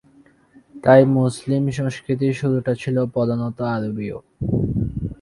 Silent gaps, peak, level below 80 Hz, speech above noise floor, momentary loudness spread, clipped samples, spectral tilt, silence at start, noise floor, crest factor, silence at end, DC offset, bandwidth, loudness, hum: none; -2 dBFS; -42 dBFS; 34 dB; 13 LU; under 0.1%; -8 dB/octave; 0.75 s; -53 dBFS; 20 dB; 0.05 s; under 0.1%; 11.5 kHz; -20 LUFS; none